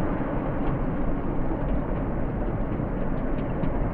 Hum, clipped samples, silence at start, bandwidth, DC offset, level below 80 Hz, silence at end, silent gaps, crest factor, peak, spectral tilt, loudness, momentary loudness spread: none; under 0.1%; 0 s; 3.5 kHz; under 0.1%; -30 dBFS; 0 s; none; 12 dB; -12 dBFS; -11.5 dB/octave; -29 LUFS; 1 LU